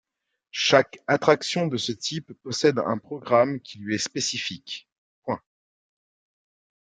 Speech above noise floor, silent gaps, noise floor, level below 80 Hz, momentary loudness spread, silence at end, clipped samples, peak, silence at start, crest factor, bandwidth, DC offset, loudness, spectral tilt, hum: 56 dB; 4.92-5.23 s; -80 dBFS; -70 dBFS; 15 LU; 1.5 s; under 0.1%; -2 dBFS; 0.55 s; 24 dB; 9.6 kHz; under 0.1%; -24 LUFS; -4 dB/octave; none